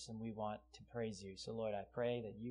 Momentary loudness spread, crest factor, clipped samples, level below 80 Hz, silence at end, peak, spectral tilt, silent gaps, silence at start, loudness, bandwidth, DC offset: 8 LU; 16 dB; under 0.1%; -70 dBFS; 0 s; -30 dBFS; -5.5 dB/octave; none; 0 s; -45 LUFS; 10.5 kHz; under 0.1%